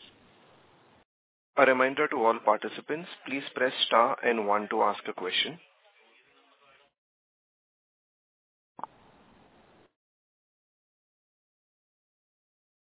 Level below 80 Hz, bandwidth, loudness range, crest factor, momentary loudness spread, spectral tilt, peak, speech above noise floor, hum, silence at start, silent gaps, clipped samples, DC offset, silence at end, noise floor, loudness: -84 dBFS; 4 kHz; 9 LU; 26 dB; 13 LU; -0.5 dB/octave; -6 dBFS; 36 dB; none; 1.55 s; none; under 0.1%; under 0.1%; 7.25 s; -63 dBFS; -27 LUFS